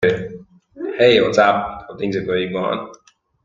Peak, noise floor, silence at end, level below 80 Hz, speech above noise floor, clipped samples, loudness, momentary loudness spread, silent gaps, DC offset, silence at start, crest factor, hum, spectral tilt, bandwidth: 0 dBFS; -39 dBFS; 0.5 s; -52 dBFS; 22 dB; under 0.1%; -18 LUFS; 16 LU; none; under 0.1%; 0 s; 18 dB; none; -5.5 dB/octave; 7.6 kHz